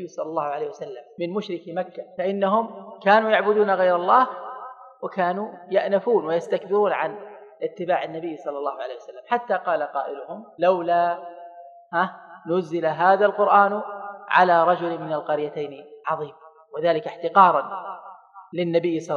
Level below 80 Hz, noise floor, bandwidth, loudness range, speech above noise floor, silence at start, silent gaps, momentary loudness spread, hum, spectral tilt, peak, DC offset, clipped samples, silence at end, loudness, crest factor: -82 dBFS; -44 dBFS; 7.6 kHz; 6 LU; 22 dB; 0 s; none; 18 LU; none; -6.5 dB/octave; -2 dBFS; under 0.1%; under 0.1%; 0 s; -22 LUFS; 20 dB